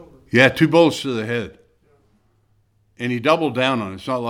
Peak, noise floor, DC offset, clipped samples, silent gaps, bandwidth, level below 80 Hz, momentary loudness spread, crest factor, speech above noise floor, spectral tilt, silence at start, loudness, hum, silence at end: 0 dBFS; -61 dBFS; under 0.1%; under 0.1%; none; 16 kHz; -56 dBFS; 12 LU; 20 dB; 43 dB; -5.5 dB/octave; 0 s; -18 LUFS; none; 0 s